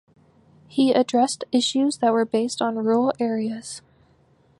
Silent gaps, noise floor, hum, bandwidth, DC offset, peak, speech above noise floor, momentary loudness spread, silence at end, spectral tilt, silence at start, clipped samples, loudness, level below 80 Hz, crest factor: none; -59 dBFS; none; 11.5 kHz; under 0.1%; -8 dBFS; 37 dB; 11 LU; 0.8 s; -4 dB/octave; 0.7 s; under 0.1%; -22 LUFS; -68 dBFS; 16 dB